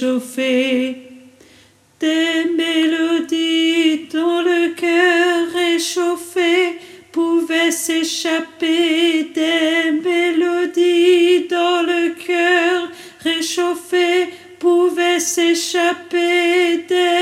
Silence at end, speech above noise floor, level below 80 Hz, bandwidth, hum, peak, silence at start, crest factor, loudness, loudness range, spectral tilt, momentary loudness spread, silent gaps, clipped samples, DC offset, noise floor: 0 s; 33 dB; -72 dBFS; 15.5 kHz; none; -4 dBFS; 0 s; 12 dB; -16 LUFS; 3 LU; -1.5 dB/octave; 6 LU; none; under 0.1%; under 0.1%; -50 dBFS